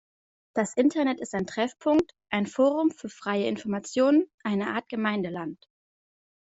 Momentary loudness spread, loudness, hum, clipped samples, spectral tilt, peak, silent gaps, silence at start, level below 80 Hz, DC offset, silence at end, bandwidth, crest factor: 8 LU; -27 LUFS; none; under 0.1%; -5.5 dB/octave; -10 dBFS; 4.34-4.38 s; 0.55 s; -66 dBFS; under 0.1%; 0.9 s; 8 kHz; 18 dB